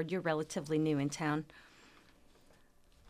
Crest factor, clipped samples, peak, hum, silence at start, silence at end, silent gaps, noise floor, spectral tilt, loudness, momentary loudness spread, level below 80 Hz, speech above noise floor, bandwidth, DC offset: 16 dB; under 0.1%; -20 dBFS; none; 0 s; 1.45 s; none; -64 dBFS; -6 dB/octave; -35 LUFS; 13 LU; -68 dBFS; 29 dB; 14.5 kHz; under 0.1%